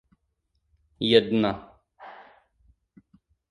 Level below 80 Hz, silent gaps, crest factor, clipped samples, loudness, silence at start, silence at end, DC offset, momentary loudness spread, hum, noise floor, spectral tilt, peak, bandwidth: -60 dBFS; none; 26 dB; under 0.1%; -23 LUFS; 1 s; 1.35 s; under 0.1%; 26 LU; none; -75 dBFS; -6.5 dB/octave; -4 dBFS; 10 kHz